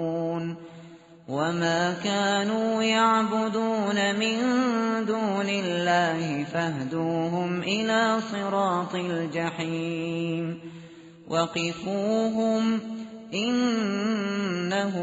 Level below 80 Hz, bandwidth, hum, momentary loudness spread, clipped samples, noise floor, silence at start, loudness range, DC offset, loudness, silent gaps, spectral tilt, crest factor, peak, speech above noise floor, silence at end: -68 dBFS; 8 kHz; none; 7 LU; under 0.1%; -48 dBFS; 0 s; 5 LU; under 0.1%; -26 LUFS; none; -4 dB/octave; 16 dB; -10 dBFS; 22 dB; 0 s